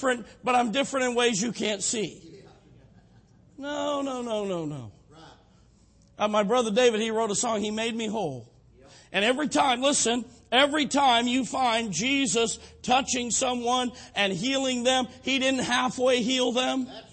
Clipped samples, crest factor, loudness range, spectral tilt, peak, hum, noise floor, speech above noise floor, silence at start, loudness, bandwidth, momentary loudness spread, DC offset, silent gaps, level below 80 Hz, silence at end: under 0.1%; 18 dB; 9 LU; -2.5 dB/octave; -10 dBFS; none; -58 dBFS; 33 dB; 0 s; -25 LUFS; 8.8 kHz; 9 LU; under 0.1%; none; -60 dBFS; 0.1 s